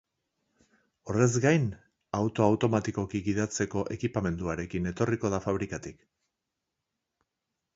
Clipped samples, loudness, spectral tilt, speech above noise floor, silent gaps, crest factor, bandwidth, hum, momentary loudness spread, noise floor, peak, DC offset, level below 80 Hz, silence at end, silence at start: under 0.1%; -29 LUFS; -6 dB/octave; 57 dB; none; 22 dB; 8 kHz; none; 9 LU; -85 dBFS; -8 dBFS; under 0.1%; -52 dBFS; 1.85 s; 1.05 s